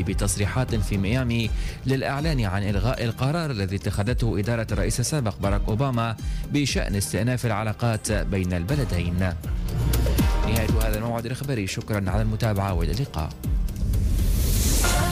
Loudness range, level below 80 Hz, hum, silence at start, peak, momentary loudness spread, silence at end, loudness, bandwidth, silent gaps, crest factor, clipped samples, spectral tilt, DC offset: 1 LU; -28 dBFS; none; 0 s; -12 dBFS; 5 LU; 0 s; -25 LUFS; 16 kHz; none; 12 dB; under 0.1%; -5.5 dB/octave; under 0.1%